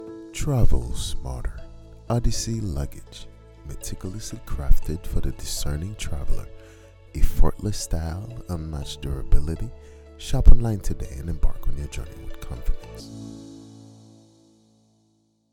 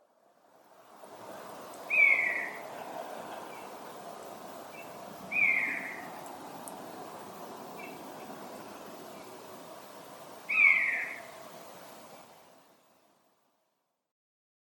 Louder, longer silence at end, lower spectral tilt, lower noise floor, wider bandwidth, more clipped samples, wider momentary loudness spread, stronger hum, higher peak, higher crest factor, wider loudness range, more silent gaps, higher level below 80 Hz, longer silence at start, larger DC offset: about the same, -29 LUFS vs -27 LUFS; about the same, 2 s vs 2.1 s; first, -5.5 dB/octave vs -2.5 dB/octave; second, -66 dBFS vs -80 dBFS; second, 13 kHz vs 17.5 kHz; neither; second, 20 LU vs 25 LU; neither; first, 0 dBFS vs -10 dBFS; about the same, 20 dB vs 24 dB; second, 8 LU vs 15 LU; neither; first, -24 dBFS vs -82 dBFS; second, 0 s vs 0.7 s; neither